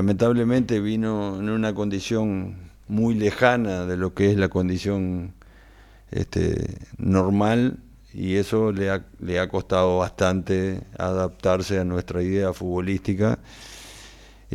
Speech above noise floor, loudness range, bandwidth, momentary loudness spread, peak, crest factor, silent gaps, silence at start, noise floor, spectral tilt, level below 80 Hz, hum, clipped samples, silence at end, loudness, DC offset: 26 dB; 2 LU; 13.5 kHz; 12 LU; -2 dBFS; 20 dB; none; 0 s; -49 dBFS; -7 dB/octave; -46 dBFS; none; under 0.1%; 0 s; -24 LUFS; under 0.1%